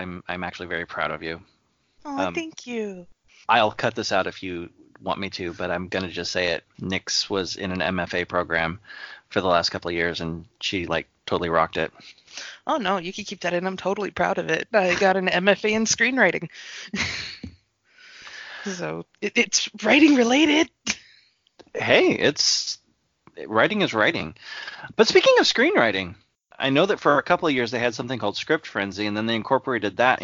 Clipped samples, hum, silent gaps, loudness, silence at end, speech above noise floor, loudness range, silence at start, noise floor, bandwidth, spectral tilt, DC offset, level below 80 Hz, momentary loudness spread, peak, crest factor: under 0.1%; none; none; -22 LUFS; 0 s; 36 dB; 7 LU; 0 s; -59 dBFS; 7.6 kHz; -3.5 dB/octave; under 0.1%; -58 dBFS; 17 LU; -2 dBFS; 22 dB